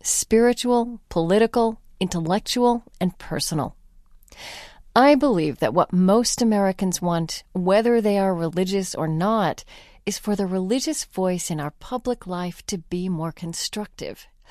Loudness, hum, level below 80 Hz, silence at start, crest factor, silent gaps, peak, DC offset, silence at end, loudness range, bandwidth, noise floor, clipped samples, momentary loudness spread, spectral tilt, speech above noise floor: -22 LUFS; none; -50 dBFS; 0.05 s; 20 dB; none; -2 dBFS; under 0.1%; 0.3 s; 6 LU; 14.5 kHz; -50 dBFS; under 0.1%; 12 LU; -5 dB/octave; 28 dB